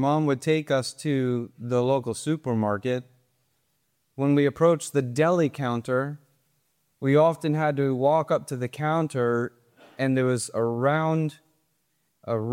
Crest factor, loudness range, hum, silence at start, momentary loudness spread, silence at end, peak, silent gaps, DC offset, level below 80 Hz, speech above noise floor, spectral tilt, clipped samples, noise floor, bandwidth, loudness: 16 dB; 3 LU; none; 0 s; 9 LU; 0 s; -8 dBFS; none; under 0.1%; -70 dBFS; 49 dB; -6.5 dB/octave; under 0.1%; -73 dBFS; 16 kHz; -25 LUFS